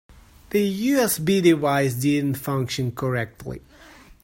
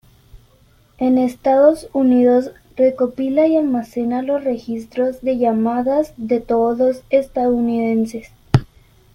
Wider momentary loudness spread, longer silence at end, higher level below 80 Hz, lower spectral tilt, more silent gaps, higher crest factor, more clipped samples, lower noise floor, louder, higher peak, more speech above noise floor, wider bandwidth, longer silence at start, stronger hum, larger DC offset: first, 13 LU vs 8 LU; second, 0.1 s vs 0.5 s; second, -52 dBFS vs -46 dBFS; second, -5.5 dB/octave vs -8.5 dB/octave; neither; about the same, 18 dB vs 16 dB; neither; second, -48 dBFS vs -53 dBFS; second, -22 LUFS vs -17 LUFS; second, -4 dBFS vs 0 dBFS; second, 26 dB vs 36 dB; first, 16.5 kHz vs 13 kHz; first, 0.5 s vs 0.35 s; neither; neither